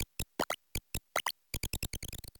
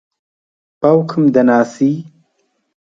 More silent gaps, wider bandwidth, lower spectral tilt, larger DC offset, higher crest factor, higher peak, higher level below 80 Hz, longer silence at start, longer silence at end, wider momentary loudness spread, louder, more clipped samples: neither; first, 19 kHz vs 7.6 kHz; second, -2.5 dB/octave vs -8 dB/octave; neither; first, 24 dB vs 16 dB; second, -16 dBFS vs 0 dBFS; first, -48 dBFS vs -60 dBFS; second, 0 s vs 0.8 s; second, 0 s vs 0.85 s; about the same, 5 LU vs 6 LU; second, -38 LUFS vs -13 LUFS; neither